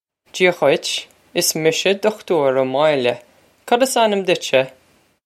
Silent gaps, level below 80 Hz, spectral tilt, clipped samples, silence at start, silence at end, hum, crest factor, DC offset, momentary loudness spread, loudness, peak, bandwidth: none; -70 dBFS; -3 dB/octave; under 0.1%; 0.35 s; 0.55 s; none; 18 dB; under 0.1%; 9 LU; -17 LUFS; 0 dBFS; 16 kHz